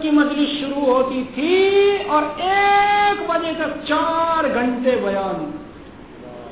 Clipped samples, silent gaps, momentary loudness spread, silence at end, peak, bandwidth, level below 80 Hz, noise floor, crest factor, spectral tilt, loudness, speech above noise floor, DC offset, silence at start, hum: under 0.1%; none; 11 LU; 0 s; -6 dBFS; 4 kHz; -50 dBFS; -39 dBFS; 14 dB; -8.5 dB/octave; -18 LUFS; 21 dB; 0.2%; 0 s; none